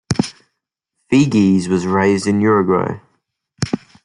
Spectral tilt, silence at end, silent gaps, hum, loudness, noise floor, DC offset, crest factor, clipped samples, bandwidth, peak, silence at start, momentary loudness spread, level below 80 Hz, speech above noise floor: -6.5 dB/octave; 0.25 s; none; none; -16 LUFS; -76 dBFS; under 0.1%; 16 dB; under 0.1%; 11 kHz; 0 dBFS; 0.1 s; 12 LU; -50 dBFS; 62 dB